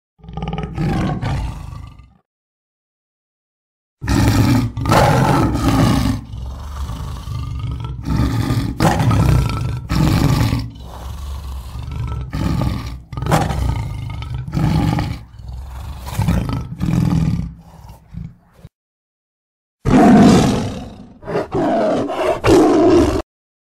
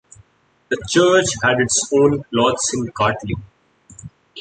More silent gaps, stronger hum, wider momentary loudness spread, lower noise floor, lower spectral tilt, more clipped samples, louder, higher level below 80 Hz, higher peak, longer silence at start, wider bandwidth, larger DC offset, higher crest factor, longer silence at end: first, 2.25-3.97 s, 18.75-19.78 s vs none; neither; first, 19 LU vs 12 LU; second, -41 dBFS vs -56 dBFS; first, -7 dB/octave vs -3.5 dB/octave; neither; about the same, -17 LUFS vs -17 LUFS; first, -28 dBFS vs -46 dBFS; about the same, 0 dBFS vs -2 dBFS; second, 0.25 s vs 0.7 s; first, 16 kHz vs 9.4 kHz; neither; about the same, 16 dB vs 18 dB; first, 0.5 s vs 0 s